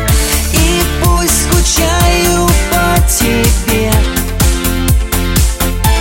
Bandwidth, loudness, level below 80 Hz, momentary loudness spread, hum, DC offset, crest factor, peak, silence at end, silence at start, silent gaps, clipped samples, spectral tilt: 17.5 kHz; -11 LUFS; -14 dBFS; 3 LU; none; under 0.1%; 10 dB; 0 dBFS; 0 s; 0 s; none; under 0.1%; -4 dB/octave